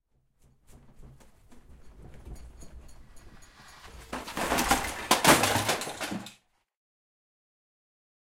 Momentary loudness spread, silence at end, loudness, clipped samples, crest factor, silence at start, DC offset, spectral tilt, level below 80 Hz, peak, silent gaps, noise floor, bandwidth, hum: 28 LU; 1.9 s; -26 LUFS; under 0.1%; 28 dB; 0.75 s; under 0.1%; -2.5 dB/octave; -50 dBFS; -4 dBFS; none; -65 dBFS; 16.5 kHz; none